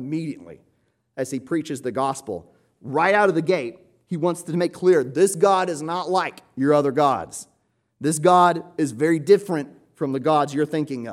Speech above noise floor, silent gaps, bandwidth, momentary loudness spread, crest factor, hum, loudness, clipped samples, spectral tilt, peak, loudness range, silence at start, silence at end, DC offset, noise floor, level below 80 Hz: 47 dB; none; 15 kHz; 15 LU; 18 dB; none; -21 LUFS; under 0.1%; -5.5 dB/octave; -4 dBFS; 3 LU; 0 s; 0 s; under 0.1%; -68 dBFS; -68 dBFS